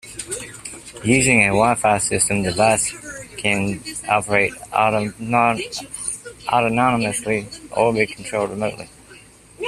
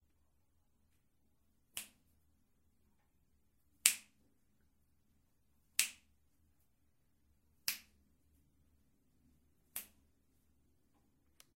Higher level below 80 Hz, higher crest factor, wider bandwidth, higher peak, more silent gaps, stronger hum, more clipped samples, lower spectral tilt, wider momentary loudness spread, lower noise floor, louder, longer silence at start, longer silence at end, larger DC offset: first, -48 dBFS vs -80 dBFS; second, 20 dB vs 44 dB; second, 14 kHz vs 16 kHz; first, 0 dBFS vs -6 dBFS; neither; neither; neither; first, -4 dB/octave vs 2.5 dB/octave; second, 13 LU vs 17 LU; second, -45 dBFS vs -79 dBFS; first, -19 LUFS vs -38 LUFS; second, 0.05 s vs 1.75 s; second, 0 s vs 1.75 s; neither